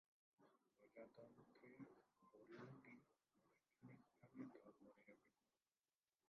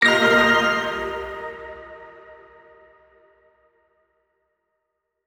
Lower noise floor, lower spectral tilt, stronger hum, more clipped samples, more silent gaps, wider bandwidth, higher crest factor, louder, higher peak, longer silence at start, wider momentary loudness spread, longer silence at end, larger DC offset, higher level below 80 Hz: first, under -90 dBFS vs -78 dBFS; first, -6.5 dB/octave vs -3.5 dB/octave; neither; neither; neither; second, 5.8 kHz vs over 20 kHz; about the same, 22 dB vs 20 dB; second, -65 LUFS vs -19 LUFS; second, -44 dBFS vs -4 dBFS; first, 0.4 s vs 0 s; second, 8 LU vs 26 LU; second, 1 s vs 2.9 s; neither; second, under -90 dBFS vs -54 dBFS